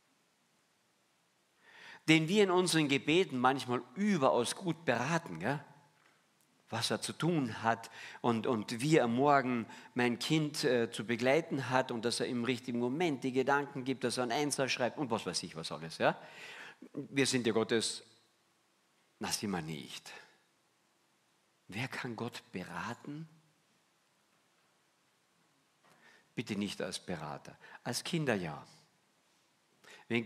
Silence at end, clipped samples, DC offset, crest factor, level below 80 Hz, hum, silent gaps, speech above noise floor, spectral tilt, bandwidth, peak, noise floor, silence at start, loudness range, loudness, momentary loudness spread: 0 s; under 0.1%; under 0.1%; 24 dB; -78 dBFS; none; none; 40 dB; -4.5 dB/octave; 15.5 kHz; -10 dBFS; -74 dBFS; 1.75 s; 13 LU; -34 LUFS; 16 LU